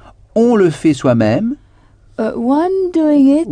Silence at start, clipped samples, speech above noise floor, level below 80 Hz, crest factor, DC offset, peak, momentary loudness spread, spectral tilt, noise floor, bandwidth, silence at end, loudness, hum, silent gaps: 0.35 s; under 0.1%; 34 dB; -46 dBFS; 12 dB; under 0.1%; -2 dBFS; 11 LU; -7.5 dB/octave; -46 dBFS; 10 kHz; 0 s; -14 LUFS; none; none